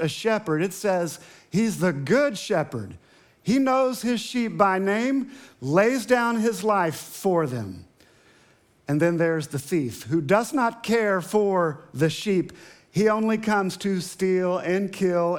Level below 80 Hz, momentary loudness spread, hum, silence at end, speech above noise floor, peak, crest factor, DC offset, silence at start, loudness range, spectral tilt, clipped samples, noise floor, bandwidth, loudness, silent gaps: -68 dBFS; 8 LU; none; 0 s; 36 dB; -4 dBFS; 20 dB; under 0.1%; 0 s; 3 LU; -5.5 dB/octave; under 0.1%; -59 dBFS; 19 kHz; -24 LUFS; none